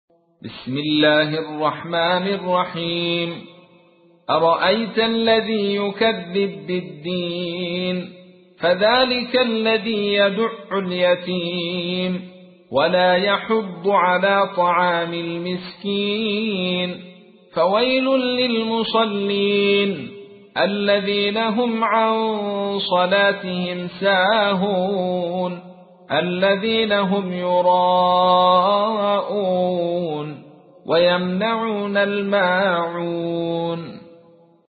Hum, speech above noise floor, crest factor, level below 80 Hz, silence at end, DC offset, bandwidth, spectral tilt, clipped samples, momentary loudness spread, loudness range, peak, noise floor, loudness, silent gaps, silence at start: none; 34 dB; 16 dB; -60 dBFS; 0.55 s; under 0.1%; 4.8 kHz; -10.5 dB/octave; under 0.1%; 10 LU; 4 LU; -4 dBFS; -53 dBFS; -19 LUFS; none; 0.45 s